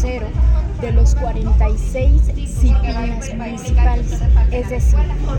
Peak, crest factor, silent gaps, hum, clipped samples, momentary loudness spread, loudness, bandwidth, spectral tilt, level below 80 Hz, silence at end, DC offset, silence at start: -4 dBFS; 12 dB; none; none; under 0.1%; 6 LU; -18 LUFS; 9 kHz; -7 dB/octave; -14 dBFS; 0 s; under 0.1%; 0 s